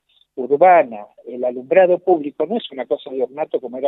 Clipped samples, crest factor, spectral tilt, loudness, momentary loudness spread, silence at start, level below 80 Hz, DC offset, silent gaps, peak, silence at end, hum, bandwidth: under 0.1%; 18 dB; -8.5 dB/octave; -18 LUFS; 16 LU; 0.35 s; -76 dBFS; under 0.1%; none; 0 dBFS; 0 s; none; 4.1 kHz